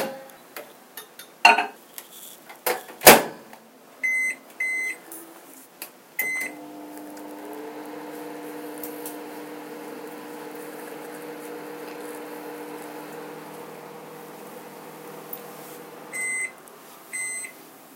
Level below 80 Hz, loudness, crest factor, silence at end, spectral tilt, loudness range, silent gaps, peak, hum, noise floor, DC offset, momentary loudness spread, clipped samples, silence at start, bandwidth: -62 dBFS; -22 LUFS; 28 dB; 0 s; -1.5 dB/octave; 18 LU; none; 0 dBFS; none; -48 dBFS; under 0.1%; 20 LU; under 0.1%; 0 s; 17 kHz